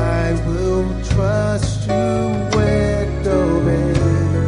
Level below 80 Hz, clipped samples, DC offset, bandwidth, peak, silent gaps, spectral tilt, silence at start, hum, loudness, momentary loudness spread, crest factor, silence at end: -26 dBFS; under 0.1%; under 0.1%; 10.5 kHz; -4 dBFS; none; -7 dB/octave; 0 s; none; -18 LUFS; 3 LU; 12 dB; 0 s